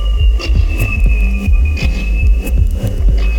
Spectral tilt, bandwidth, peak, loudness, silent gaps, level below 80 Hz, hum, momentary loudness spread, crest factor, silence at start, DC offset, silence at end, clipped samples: -6.5 dB/octave; 15.5 kHz; -2 dBFS; -15 LUFS; none; -12 dBFS; none; 2 LU; 10 dB; 0 s; under 0.1%; 0 s; under 0.1%